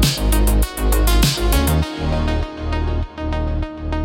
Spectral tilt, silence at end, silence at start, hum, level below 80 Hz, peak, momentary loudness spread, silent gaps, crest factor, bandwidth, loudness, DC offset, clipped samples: -5 dB/octave; 0 s; 0 s; none; -20 dBFS; -4 dBFS; 8 LU; none; 14 dB; 17 kHz; -19 LUFS; under 0.1%; under 0.1%